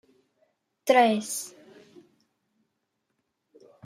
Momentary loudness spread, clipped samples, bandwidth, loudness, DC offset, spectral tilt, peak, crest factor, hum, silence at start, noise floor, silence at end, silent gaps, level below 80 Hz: 15 LU; under 0.1%; 16 kHz; -24 LUFS; under 0.1%; -3 dB/octave; -8 dBFS; 22 dB; none; 0.85 s; -79 dBFS; 2.35 s; none; -82 dBFS